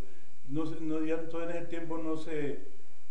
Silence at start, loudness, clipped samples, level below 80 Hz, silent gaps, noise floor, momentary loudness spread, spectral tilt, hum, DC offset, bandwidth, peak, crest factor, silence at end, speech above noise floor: 0 s; -37 LUFS; under 0.1%; -72 dBFS; none; -57 dBFS; 6 LU; -7 dB/octave; none; 6%; 10 kHz; -18 dBFS; 16 dB; 0.35 s; 21 dB